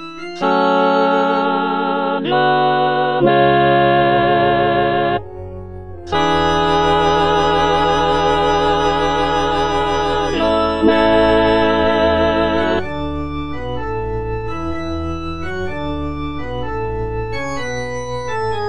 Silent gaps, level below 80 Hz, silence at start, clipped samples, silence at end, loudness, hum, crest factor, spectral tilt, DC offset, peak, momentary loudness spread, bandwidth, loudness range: none; -34 dBFS; 0 s; under 0.1%; 0 s; -16 LUFS; none; 16 dB; -5.5 dB/octave; 3%; 0 dBFS; 11 LU; 9.6 kHz; 9 LU